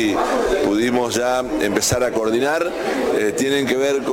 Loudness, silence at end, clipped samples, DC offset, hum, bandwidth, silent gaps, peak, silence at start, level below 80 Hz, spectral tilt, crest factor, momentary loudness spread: -19 LUFS; 0 s; under 0.1%; under 0.1%; none; 17 kHz; none; -6 dBFS; 0 s; -44 dBFS; -3.5 dB/octave; 12 dB; 2 LU